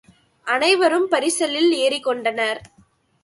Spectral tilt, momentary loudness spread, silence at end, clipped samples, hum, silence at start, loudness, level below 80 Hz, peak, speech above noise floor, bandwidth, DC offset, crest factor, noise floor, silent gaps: -1.5 dB/octave; 8 LU; 0.6 s; under 0.1%; none; 0.45 s; -19 LUFS; -64 dBFS; -4 dBFS; 38 dB; 11.5 kHz; under 0.1%; 18 dB; -58 dBFS; none